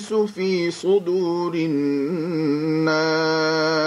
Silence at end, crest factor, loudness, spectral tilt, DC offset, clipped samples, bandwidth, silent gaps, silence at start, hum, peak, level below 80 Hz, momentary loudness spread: 0 s; 12 dB; -21 LUFS; -5.5 dB/octave; under 0.1%; under 0.1%; 11.5 kHz; none; 0 s; none; -8 dBFS; -68 dBFS; 4 LU